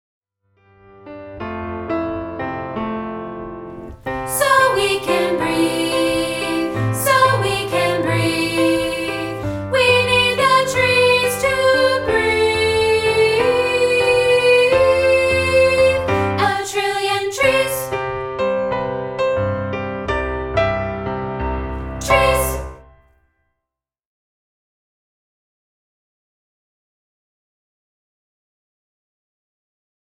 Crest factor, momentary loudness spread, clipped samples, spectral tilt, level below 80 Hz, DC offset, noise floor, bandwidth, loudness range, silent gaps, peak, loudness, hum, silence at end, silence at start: 16 dB; 12 LU; under 0.1%; -4 dB/octave; -38 dBFS; under 0.1%; -84 dBFS; 17.5 kHz; 8 LU; none; -2 dBFS; -17 LUFS; none; 7.35 s; 1.05 s